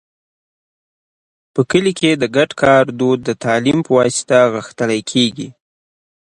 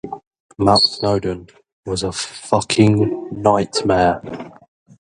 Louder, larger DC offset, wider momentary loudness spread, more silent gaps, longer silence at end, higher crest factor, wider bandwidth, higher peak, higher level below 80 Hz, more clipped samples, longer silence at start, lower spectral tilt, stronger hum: about the same, -15 LUFS vs -17 LUFS; neither; second, 8 LU vs 19 LU; second, none vs 0.27-0.31 s, 0.40-0.49 s, 1.72-1.83 s; first, 0.8 s vs 0.55 s; about the same, 16 dB vs 18 dB; about the same, 11.5 kHz vs 11.5 kHz; about the same, 0 dBFS vs 0 dBFS; second, -54 dBFS vs -44 dBFS; neither; first, 1.55 s vs 0.05 s; about the same, -4.5 dB/octave vs -5 dB/octave; neither